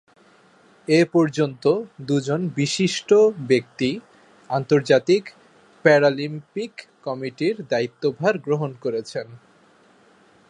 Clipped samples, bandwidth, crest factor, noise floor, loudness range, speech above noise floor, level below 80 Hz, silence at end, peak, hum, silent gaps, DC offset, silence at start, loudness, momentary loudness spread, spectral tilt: under 0.1%; 11 kHz; 20 dB; -55 dBFS; 6 LU; 34 dB; -70 dBFS; 1.1 s; -2 dBFS; none; none; under 0.1%; 0.9 s; -21 LUFS; 15 LU; -5.5 dB/octave